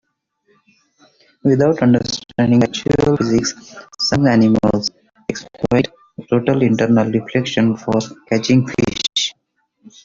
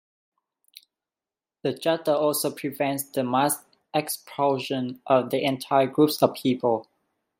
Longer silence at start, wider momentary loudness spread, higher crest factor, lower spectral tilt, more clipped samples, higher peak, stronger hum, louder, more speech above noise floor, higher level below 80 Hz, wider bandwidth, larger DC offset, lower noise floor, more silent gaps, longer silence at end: second, 1.45 s vs 1.65 s; first, 11 LU vs 8 LU; second, 14 dB vs 22 dB; about the same, -5.5 dB/octave vs -4.5 dB/octave; neither; about the same, -2 dBFS vs -4 dBFS; neither; first, -17 LUFS vs -25 LUFS; second, 51 dB vs over 66 dB; first, -46 dBFS vs -74 dBFS; second, 7.6 kHz vs 16.5 kHz; neither; second, -67 dBFS vs under -90 dBFS; neither; first, 0.75 s vs 0.6 s